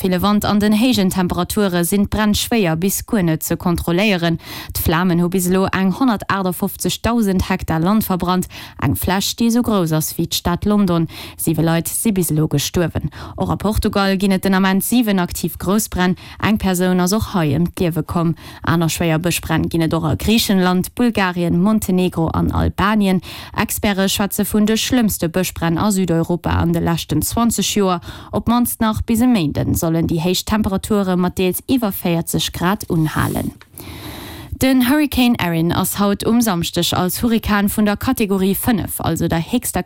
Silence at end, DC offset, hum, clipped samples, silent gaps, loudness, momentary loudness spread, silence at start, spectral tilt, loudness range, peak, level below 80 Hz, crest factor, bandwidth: 0 s; under 0.1%; none; under 0.1%; none; -17 LUFS; 5 LU; 0 s; -5 dB/octave; 2 LU; -4 dBFS; -36 dBFS; 14 dB; 17 kHz